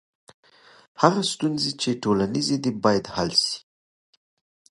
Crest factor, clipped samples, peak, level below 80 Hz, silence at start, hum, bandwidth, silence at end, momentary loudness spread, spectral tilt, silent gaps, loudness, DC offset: 24 dB; under 0.1%; 0 dBFS; -56 dBFS; 1 s; none; 11.5 kHz; 1.1 s; 4 LU; -4.5 dB/octave; none; -23 LUFS; under 0.1%